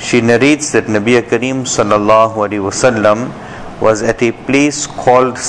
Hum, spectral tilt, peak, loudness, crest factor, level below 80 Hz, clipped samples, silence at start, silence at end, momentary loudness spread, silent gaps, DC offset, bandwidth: none; -4.5 dB/octave; 0 dBFS; -12 LUFS; 12 dB; -42 dBFS; 0.1%; 0 s; 0 s; 6 LU; none; 0.2%; 10.5 kHz